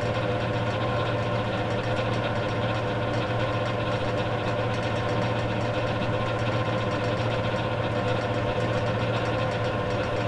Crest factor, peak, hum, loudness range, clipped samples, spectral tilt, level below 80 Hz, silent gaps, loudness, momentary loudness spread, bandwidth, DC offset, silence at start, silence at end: 12 dB; -14 dBFS; none; 0 LU; under 0.1%; -6.5 dB/octave; -44 dBFS; none; -27 LUFS; 1 LU; 10.5 kHz; under 0.1%; 0 s; 0 s